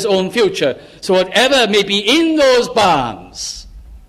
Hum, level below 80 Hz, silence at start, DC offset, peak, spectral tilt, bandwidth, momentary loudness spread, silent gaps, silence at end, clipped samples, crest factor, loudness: none; -42 dBFS; 0 s; under 0.1%; -2 dBFS; -3.5 dB/octave; 15.5 kHz; 14 LU; none; 0.1 s; under 0.1%; 14 dB; -13 LUFS